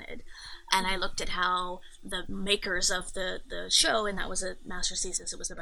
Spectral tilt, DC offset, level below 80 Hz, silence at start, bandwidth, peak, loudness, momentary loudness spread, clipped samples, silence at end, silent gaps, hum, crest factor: -1 dB/octave; under 0.1%; -42 dBFS; 0 s; 13 kHz; -6 dBFS; -29 LUFS; 14 LU; under 0.1%; 0 s; none; none; 26 dB